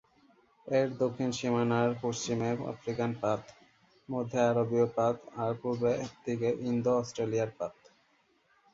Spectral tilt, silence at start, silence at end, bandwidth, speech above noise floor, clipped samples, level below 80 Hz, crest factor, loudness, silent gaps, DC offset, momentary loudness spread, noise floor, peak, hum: -6 dB/octave; 0.65 s; 1 s; 7.8 kHz; 39 dB; under 0.1%; -68 dBFS; 18 dB; -32 LUFS; none; under 0.1%; 8 LU; -70 dBFS; -14 dBFS; none